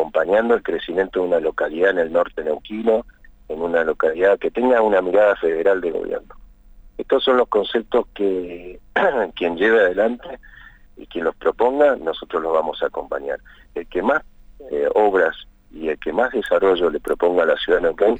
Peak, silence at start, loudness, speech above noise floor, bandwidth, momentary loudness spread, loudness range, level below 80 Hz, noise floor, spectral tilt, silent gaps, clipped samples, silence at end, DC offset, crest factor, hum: -4 dBFS; 0 s; -19 LUFS; 26 dB; 9 kHz; 12 LU; 3 LU; -46 dBFS; -45 dBFS; -6 dB/octave; none; under 0.1%; 0 s; under 0.1%; 14 dB; none